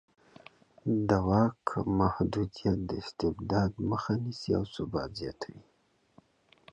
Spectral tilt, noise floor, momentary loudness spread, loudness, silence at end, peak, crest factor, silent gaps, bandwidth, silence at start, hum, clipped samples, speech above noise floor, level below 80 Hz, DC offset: -8 dB/octave; -64 dBFS; 11 LU; -31 LUFS; 1.1 s; -12 dBFS; 20 dB; none; 9.4 kHz; 0.85 s; none; under 0.1%; 34 dB; -50 dBFS; under 0.1%